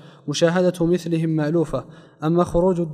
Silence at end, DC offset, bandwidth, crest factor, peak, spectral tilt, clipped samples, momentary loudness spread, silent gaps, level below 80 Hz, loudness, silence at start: 0 s; under 0.1%; 12.5 kHz; 14 dB; -6 dBFS; -6.5 dB/octave; under 0.1%; 9 LU; none; -42 dBFS; -21 LUFS; 0.05 s